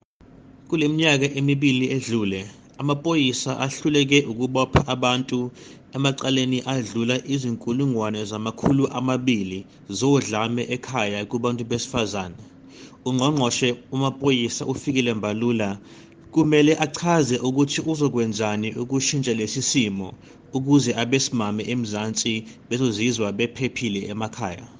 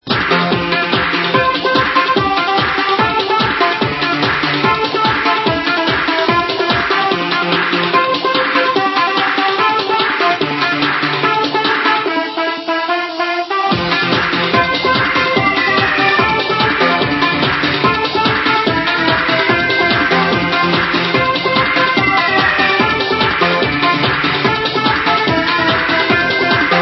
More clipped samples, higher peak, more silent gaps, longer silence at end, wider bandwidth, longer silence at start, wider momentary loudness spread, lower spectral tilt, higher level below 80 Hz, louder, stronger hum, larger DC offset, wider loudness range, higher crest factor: neither; second, -4 dBFS vs 0 dBFS; neither; about the same, 0 s vs 0 s; first, 10 kHz vs 6.2 kHz; first, 0.45 s vs 0.05 s; first, 9 LU vs 3 LU; about the same, -4.5 dB/octave vs -5.5 dB/octave; second, -52 dBFS vs -42 dBFS; second, -23 LUFS vs -13 LUFS; neither; neither; about the same, 3 LU vs 2 LU; first, 20 dB vs 14 dB